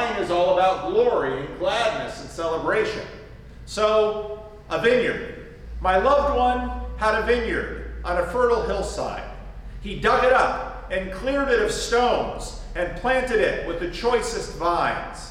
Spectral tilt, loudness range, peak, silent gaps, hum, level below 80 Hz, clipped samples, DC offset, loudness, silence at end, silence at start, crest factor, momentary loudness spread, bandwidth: -4.5 dB/octave; 3 LU; -6 dBFS; none; none; -38 dBFS; under 0.1%; under 0.1%; -23 LUFS; 0 s; 0 s; 16 dB; 14 LU; 14 kHz